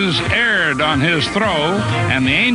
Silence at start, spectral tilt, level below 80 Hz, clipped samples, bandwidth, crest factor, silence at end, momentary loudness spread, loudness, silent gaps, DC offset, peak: 0 s; -5 dB/octave; -40 dBFS; under 0.1%; 11 kHz; 14 dB; 0 s; 3 LU; -15 LUFS; none; under 0.1%; -2 dBFS